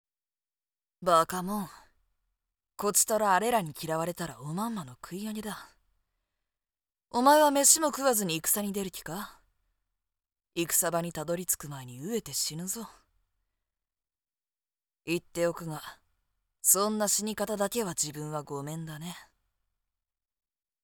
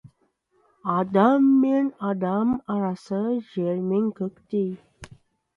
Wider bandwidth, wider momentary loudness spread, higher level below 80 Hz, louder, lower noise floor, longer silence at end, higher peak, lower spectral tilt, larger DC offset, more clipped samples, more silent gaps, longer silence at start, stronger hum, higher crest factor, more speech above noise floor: first, over 20 kHz vs 6.8 kHz; first, 18 LU vs 10 LU; about the same, -66 dBFS vs -62 dBFS; second, -28 LUFS vs -24 LUFS; first, under -90 dBFS vs -68 dBFS; first, 1.6 s vs 0.5 s; about the same, -6 dBFS vs -6 dBFS; second, -3 dB/octave vs -9 dB/octave; neither; neither; neither; first, 1 s vs 0.05 s; neither; first, 26 dB vs 18 dB; first, over 61 dB vs 45 dB